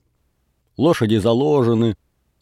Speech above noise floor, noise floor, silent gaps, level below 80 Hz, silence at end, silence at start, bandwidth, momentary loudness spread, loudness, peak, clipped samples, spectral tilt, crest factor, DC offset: 50 dB; -66 dBFS; none; -54 dBFS; 0.45 s; 0.8 s; 13.5 kHz; 5 LU; -18 LUFS; -4 dBFS; under 0.1%; -7.5 dB/octave; 16 dB; under 0.1%